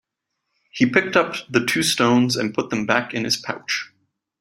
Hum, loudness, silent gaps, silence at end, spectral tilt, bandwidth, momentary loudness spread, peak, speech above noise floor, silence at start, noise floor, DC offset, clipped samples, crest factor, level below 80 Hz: none; -20 LUFS; none; 0.55 s; -4 dB/octave; 16 kHz; 8 LU; -2 dBFS; 58 dB; 0.75 s; -79 dBFS; under 0.1%; under 0.1%; 20 dB; -62 dBFS